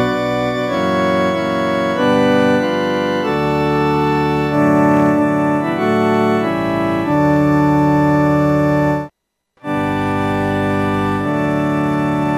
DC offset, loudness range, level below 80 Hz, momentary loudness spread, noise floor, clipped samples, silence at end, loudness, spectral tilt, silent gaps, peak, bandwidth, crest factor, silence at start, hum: under 0.1%; 3 LU; -42 dBFS; 5 LU; -63 dBFS; under 0.1%; 0 s; -15 LUFS; -7.5 dB/octave; none; -4 dBFS; 15 kHz; 12 dB; 0 s; none